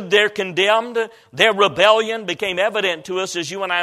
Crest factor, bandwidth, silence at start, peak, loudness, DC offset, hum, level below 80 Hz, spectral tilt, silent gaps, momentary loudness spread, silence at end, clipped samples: 18 dB; 14.5 kHz; 0 s; 0 dBFS; -18 LUFS; under 0.1%; none; -62 dBFS; -2.5 dB/octave; none; 10 LU; 0 s; under 0.1%